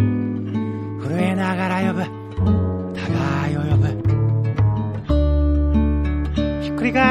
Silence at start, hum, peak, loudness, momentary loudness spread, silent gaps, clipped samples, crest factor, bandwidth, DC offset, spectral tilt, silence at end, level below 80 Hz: 0 s; none; -2 dBFS; -21 LUFS; 6 LU; none; under 0.1%; 16 dB; 10 kHz; under 0.1%; -8 dB/octave; 0 s; -26 dBFS